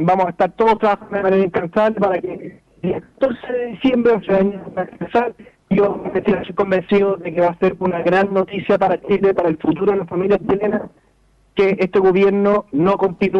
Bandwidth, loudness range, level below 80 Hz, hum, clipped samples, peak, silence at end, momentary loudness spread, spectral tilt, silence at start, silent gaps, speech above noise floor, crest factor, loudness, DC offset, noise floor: 6.2 kHz; 2 LU; -50 dBFS; none; under 0.1%; -6 dBFS; 0 s; 9 LU; -8.5 dB/octave; 0 s; none; 39 dB; 12 dB; -18 LUFS; under 0.1%; -56 dBFS